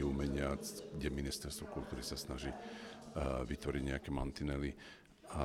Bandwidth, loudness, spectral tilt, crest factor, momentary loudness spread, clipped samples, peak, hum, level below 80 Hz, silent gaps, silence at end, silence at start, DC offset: 16 kHz; -42 LUFS; -5.5 dB/octave; 20 dB; 10 LU; under 0.1%; -22 dBFS; none; -48 dBFS; none; 0 s; 0 s; under 0.1%